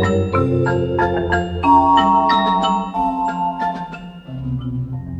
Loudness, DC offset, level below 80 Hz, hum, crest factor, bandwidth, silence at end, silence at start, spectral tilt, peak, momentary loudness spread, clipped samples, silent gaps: -17 LUFS; under 0.1%; -38 dBFS; none; 16 dB; 8.4 kHz; 0 s; 0 s; -7 dB/octave; -2 dBFS; 14 LU; under 0.1%; none